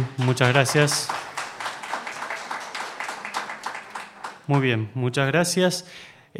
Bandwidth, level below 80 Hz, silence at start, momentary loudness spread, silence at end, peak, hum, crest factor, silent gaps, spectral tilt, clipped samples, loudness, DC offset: 16 kHz; -66 dBFS; 0 s; 16 LU; 0 s; -2 dBFS; none; 24 dB; none; -4.5 dB/octave; under 0.1%; -24 LUFS; under 0.1%